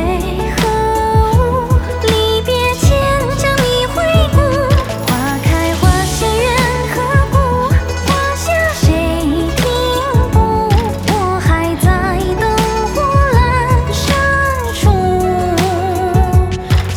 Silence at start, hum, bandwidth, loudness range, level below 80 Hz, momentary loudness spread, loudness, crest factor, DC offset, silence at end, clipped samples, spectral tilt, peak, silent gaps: 0 s; none; over 20 kHz; 1 LU; -20 dBFS; 3 LU; -13 LUFS; 12 dB; under 0.1%; 0 s; under 0.1%; -5.5 dB/octave; 0 dBFS; none